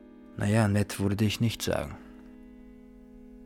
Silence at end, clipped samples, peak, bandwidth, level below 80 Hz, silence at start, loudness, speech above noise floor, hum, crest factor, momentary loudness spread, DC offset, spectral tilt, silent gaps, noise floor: 0 s; under 0.1%; -12 dBFS; 17 kHz; -52 dBFS; 0.05 s; -28 LUFS; 23 dB; none; 18 dB; 24 LU; under 0.1%; -6 dB/octave; none; -50 dBFS